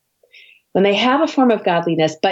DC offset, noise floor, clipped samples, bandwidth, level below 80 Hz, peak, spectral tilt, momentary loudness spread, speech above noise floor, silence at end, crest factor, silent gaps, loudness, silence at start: under 0.1%; -49 dBFS; under 0.1%; 8 kHz; -66 dBFS; -4 dBFS; -5.5 dB/octave; 4 LU; 33 dB; 0 s; 14 dB; none; -16 LUFS; 0.75 s